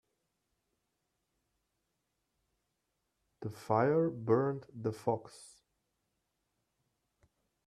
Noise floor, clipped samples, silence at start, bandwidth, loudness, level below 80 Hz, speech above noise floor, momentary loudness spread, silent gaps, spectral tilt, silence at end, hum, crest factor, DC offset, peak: -84 dBFS; under 0.1%; 3.4 s; 13.5 kHz; -33 LUFS; -78 dBFS; 51 dB; 16 LU; none; -8 dB/octave; 2.2 s; none; 22 dB; under 0.1%; -16 dBFS